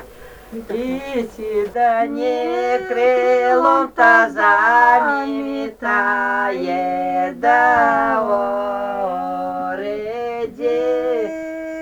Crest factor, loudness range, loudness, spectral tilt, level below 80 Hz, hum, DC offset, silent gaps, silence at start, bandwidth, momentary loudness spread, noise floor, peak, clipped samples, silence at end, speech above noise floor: 18 dB; 7 LU; -17 LUFS; -5 dB/octave; -52 dBFS; none; under 0.1%; none; 0 s; over 20 kHz; 13 LU; -39 dBFS; 0 dBFS; under 0.1%; 0 s; 23 dB